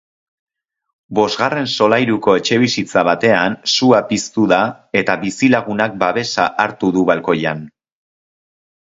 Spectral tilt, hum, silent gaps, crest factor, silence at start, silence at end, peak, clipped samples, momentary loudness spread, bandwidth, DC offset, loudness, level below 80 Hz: -4.5 dB/octave; none; none; 16 dB; 1.1 s; 1.15 s; 0 dBFS; under 0.1%; 5 LU; 8 kHz; under 0.1%; -15 LUFS; -56 dBFS